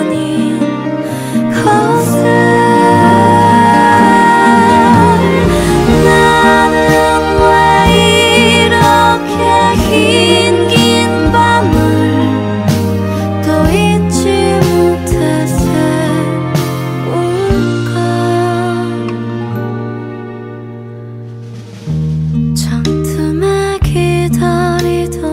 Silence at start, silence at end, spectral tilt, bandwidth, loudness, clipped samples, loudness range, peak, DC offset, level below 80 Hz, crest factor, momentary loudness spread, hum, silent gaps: 0 s; 0 s; -5.5 dB/octave; 16.5 kHz; -10 LUFS; 0.6%; 10 LU; 0 dBFS; under 0.1%; -28 dBFS; 10 dB; 12 LU; none; none